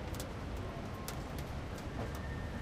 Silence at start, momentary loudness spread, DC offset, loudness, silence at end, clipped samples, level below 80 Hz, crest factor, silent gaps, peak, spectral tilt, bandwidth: 0 s; 2 LU; under 0.1%; -43 LUFS; 0 s; under 0.1%; -46 dBFS; 20 dB; none; -22 dBFS; -5.5 dB/octave; 16 kHz